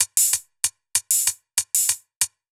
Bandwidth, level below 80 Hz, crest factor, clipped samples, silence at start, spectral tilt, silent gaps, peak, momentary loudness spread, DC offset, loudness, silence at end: over 20 kHz; -68 dBFS; 22 dB; under 0.1%; 0 s; 3.5 dB/octave; 2.16-2.20 s; -2 dBFS; 7 LU; under 0.1%; -21 LUFS; 0.25 s